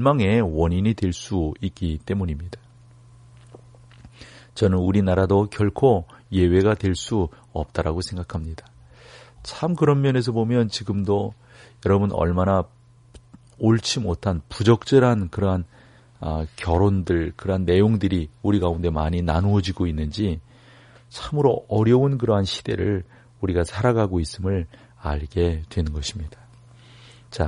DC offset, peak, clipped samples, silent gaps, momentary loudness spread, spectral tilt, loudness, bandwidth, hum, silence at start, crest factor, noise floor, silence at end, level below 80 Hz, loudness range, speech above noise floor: under 0.1%; -4 dBFS; under 0.1%; none; 12 LU; -7 dB/octave; -22 LUFS; 10.5 kHz; none; 0 s; 18 dB; -49 dBFS; 0 s; -38 dBFS; 5 LU; 28 dB